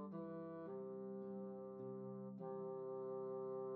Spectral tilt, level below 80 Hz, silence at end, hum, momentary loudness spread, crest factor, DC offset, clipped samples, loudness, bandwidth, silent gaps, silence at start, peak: -10.5 dB/octave; under -90 dBFS; 0 s; none; 4 LU; 10 dB; under 0.1%; under 0.1%; -50 LUFS; 4 kHz; none; 0 s; -38 dBFS